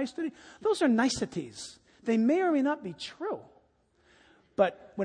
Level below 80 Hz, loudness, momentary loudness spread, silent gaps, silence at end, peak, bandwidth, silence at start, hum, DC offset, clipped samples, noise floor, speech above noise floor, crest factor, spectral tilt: -66 dBFS; -29 LUFS; 15 LU; none; 0 s; -10 dBFS; 10 kHz; 0 s; none; under 0.1%; under 0.1%; -68 dBFS; 39 dB; 20 dB; -4.5 dB/octave